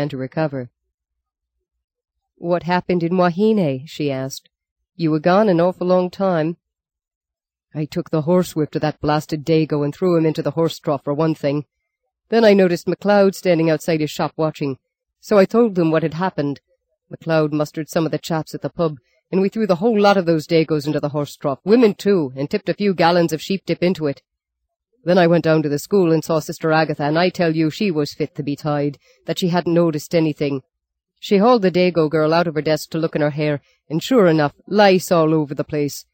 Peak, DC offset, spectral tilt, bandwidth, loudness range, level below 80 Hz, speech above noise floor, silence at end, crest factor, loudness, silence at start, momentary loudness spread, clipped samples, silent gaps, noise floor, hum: -2 dBFS; under 0.1%; -6.5 dB/octave; 17 kHz; 4 LU; -58 dBFS; 69 dB; 0.15 s; 16 dB; -18 LUFS; 0 s; 10 LU; under 0.1%; 0.94-0.98 s, 1.84-1.88 s, 4.71-4.76 s, 7.15-7.21 s; -87 dBFS; none